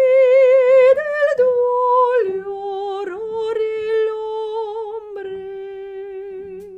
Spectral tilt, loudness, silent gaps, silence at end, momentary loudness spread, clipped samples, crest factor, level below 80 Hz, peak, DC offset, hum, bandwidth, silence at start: -4.5 dB/octave; -17 LUFS; none; 0 s; 19 LU; under 0.1%; 14 dB; -62 dBFS; -4 dBFS; under 0.1%; none; 5.2 kHz; 0 s